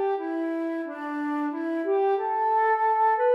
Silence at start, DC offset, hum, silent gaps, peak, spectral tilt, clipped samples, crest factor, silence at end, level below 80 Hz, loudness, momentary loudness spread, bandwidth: 0 s; under 0.1%; none; none; -14 dBFS; -5 dB/octave; under 0.1%; 12 dB; 0 s; under -90 dBFS; -26 LUFS; 9 LU; 5.8 kHz